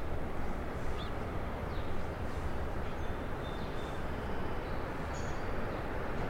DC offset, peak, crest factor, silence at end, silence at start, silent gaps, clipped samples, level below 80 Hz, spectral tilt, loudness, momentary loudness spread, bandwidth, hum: under 0.1%; -22 dBFS; 14 dB; 0 s; 0 s; none; under 0.1%; -40 dBFS; -6.5 dB/octave; -39 LUFS; 1 LU; 10.5 kHz; none